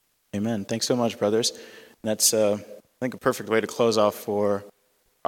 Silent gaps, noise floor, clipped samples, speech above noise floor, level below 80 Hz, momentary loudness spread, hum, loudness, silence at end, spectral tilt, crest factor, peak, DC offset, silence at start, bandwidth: none; -67 dBFS; under 0.1%; 43 dB; -70 dBFS; 12 LU; none; -24 LUFS; 0.6 s; -3.5 dB/octave; 20 dB; -6 dBFS; under 0.1%; 0.35 s; 17.5 kHz